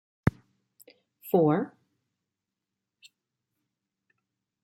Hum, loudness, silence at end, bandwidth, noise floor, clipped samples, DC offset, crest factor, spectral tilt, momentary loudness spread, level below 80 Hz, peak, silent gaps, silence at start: none; -27 LUFS; 2.95 s; 16.5 kHz; -87 dBFS; under 0.1%; under 0.1%; 28 dB; -8.5 dB/octave; 16 LU; -58 dBFS; -6 dBFS; none; 0.25 s